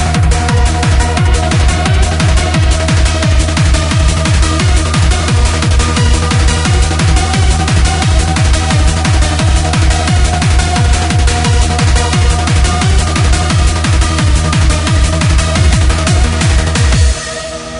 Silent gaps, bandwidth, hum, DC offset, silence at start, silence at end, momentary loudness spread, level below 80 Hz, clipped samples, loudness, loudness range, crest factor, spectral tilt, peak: none; 11 kHz; none; under 0.1%; 0 s; 0 s; 1 LU; -12 dBFS; under 0.1%; -11 LUFS; 0 LU; 10 dB; -4.5 dB/octave; 0 dBFS